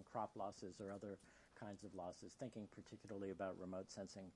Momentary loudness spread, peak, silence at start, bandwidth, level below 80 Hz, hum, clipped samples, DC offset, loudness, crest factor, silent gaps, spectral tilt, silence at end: 9 LU; -34 dBFS; 0 s; 11 kHz; -82 dBFS; none; under 0.1%; under 0.1%; -53 LUFS; 18 dB; none; -5.5 dB/octave; 0 s